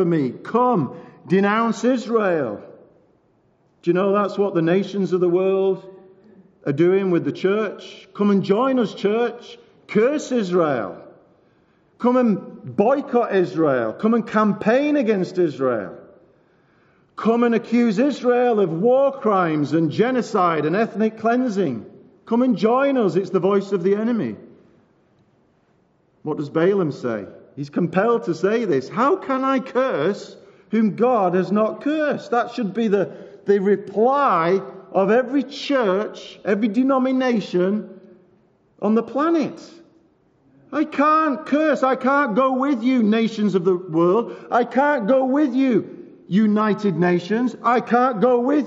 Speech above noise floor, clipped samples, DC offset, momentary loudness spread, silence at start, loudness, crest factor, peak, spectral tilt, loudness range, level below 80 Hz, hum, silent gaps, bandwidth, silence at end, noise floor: 42 dB; under 0.1%; under 0.1%; 9 LU; 0 s; -20 LUFS; 16 dB; -4 dBFS; -6 dB/octave; 4 LU; -72 dBFS; none; none; 7.8 kHz; 0 s; -61 dBFS